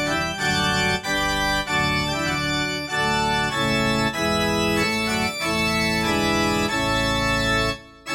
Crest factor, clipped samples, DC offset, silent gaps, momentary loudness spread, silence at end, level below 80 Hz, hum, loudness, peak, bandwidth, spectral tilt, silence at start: 14 dB; under 0.1%; under 0.1%; none; 3 LU; 0 s; -38 dBFS; none; -21 LUFS; -10 dBFS; 19 kHz; -3.5 dB/octave; 0 s